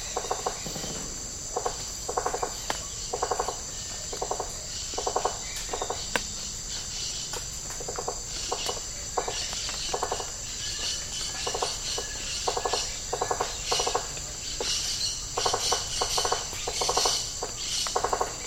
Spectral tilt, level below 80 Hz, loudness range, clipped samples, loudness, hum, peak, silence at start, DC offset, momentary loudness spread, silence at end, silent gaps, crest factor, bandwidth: -1 dB/octave; -44 dBFS; 5 LU; under 0.1%; -29 LUFS; none; -6 dBFS; 0 s; under 0.1%; 7 LU; 0 s; none; 26 dB; 17.5 kHz